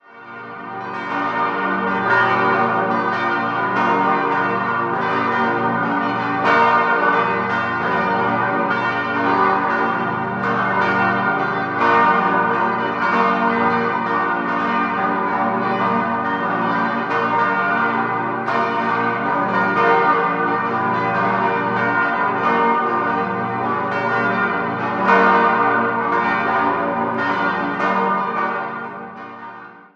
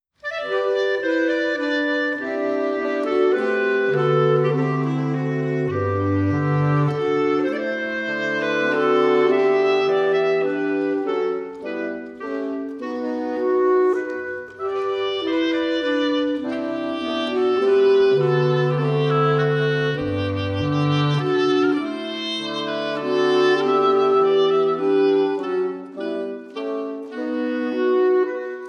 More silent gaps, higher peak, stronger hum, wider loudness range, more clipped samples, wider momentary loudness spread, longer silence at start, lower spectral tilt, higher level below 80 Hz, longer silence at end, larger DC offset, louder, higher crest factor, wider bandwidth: neither; first, -2 dBFS vs -6 dBFS; neither; second, 2 LU vs 5 LU; neither; second, 6 LU vs 10 LU; second, 0.1 s vs 0.25 s; about the same, -7 dB/octave vs -7 dB/octave; about the same, -58 dBFS vs -60 dBFS; first, 0.15 s vs 0 s; neither; first, -18 LUFS vs -21 LUFS; about the same, 16 dB vs 14 dB; about the same, 7.6 kHz vs 7 kHz